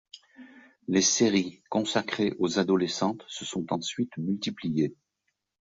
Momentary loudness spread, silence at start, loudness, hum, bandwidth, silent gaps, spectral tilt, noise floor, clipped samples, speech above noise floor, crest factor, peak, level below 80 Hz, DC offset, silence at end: 10 LU; 0.15 s; -28 LUFS; none; 8 kHz; none; -4 dB/octave; -80 dBFS; under 0.1%; 53 dB; 20 dB; -10 dBFS; -66 dBFS; under 0.1%; 0.8 s